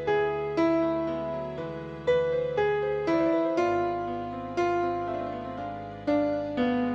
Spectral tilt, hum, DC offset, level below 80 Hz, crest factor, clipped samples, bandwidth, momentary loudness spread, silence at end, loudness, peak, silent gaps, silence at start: -7 dB/octave; none; under 0.1%; -54 dBFS; 14 dB; under 0.1%; 7.6 kHz; 10 LU; 0 s; -28 LUFS; -14 dBFS; none; 0 s